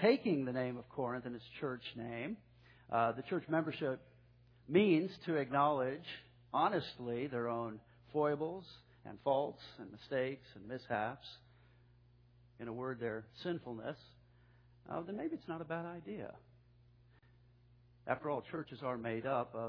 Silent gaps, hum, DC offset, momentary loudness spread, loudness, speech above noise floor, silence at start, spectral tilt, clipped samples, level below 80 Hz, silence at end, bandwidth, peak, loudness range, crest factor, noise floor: none; 60 Hz at -65 dBFS; under 0.1%; 17 LU; -39 LUFS; 28 dB; 0 s; -5 dB/octave; under 0.1%; -72 dBFS; 0 s; 5.4 kHz; -18 dBFS; 11 LU; 22 dB; -66 dBFS